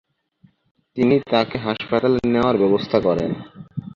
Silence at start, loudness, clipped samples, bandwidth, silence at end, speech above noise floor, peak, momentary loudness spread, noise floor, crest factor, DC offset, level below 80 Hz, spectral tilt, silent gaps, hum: 0.95 s; -19 LUFS; under 0.1%; 7.2 kHz; 0.05 s; 39 dB; -2 dBFS; 15 LU; -57 dBFS; 18 dB; under 0.1%; -50 dBFS; -8 dB/octave; none; none